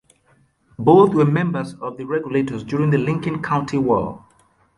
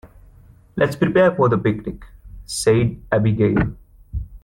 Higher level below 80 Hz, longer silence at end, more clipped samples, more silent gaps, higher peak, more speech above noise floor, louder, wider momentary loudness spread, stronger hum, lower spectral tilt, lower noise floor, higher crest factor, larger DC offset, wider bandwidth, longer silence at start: second, -52 dBFS vs -38 dBFS; first, 0.6 s vs 0.05 s; neither; neither; about the same, -2 dBFS vs -4 dBFS; first, 41 dB vs 30 dB; about the same, -19 LUFS vs -19 LUFS; second, 13 LU vs 17 LU; neither; first, -8.5 dB/octave vs -6.5 dB/octave; first, -59 dBFS vs -48 dBFS; about the same, 18 dB vs 16 dB; neither; second, 11 kHz vs 15 kHz; first, 0.8 s vs 0.05 s